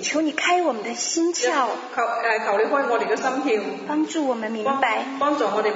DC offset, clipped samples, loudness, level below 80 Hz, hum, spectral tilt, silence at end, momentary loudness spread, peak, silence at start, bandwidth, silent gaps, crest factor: under 0.1%; under 0.1%; -22 LUFS; -78 dBFS; none; -2 dB/octave; 0 s; 4 LU; -6 dBFS; 0 s; 7.8 kHz; none; 16 dB